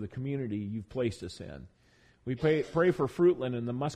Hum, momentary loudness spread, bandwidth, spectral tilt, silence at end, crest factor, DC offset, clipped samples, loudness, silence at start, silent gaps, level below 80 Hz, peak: none; 17 LU; 10 kHz; -7.5 dB/octave; 0 s; 16 dB; under 0.1%; under 0.1%; -30 LUFS; 0 s; none; -58 dBFS; -14 dBFS